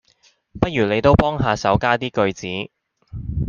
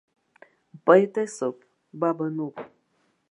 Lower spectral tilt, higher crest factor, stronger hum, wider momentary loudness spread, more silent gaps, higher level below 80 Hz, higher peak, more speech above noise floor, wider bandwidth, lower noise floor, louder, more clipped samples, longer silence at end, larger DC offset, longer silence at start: about the same, -6.5 dB/octave vs -6.5 dB/octave; second, 18 dB vs 24 dB; neither; about the same, 16 LU vs 17 LU; neither; first, -36 dBFS vs -84 dBFS; about the same, -2 dBFS vs -2 dBFS; second, 40 dB vs 47 dB; second, 7.2 kHz vs 11 kHz; second, -59 dBFS vs -70 dBFS; first, -19 LUFS vs -24 LUFS; neither; second, 0 s vs 0.65 s; neither; second, 0.55 s vs 0.85 s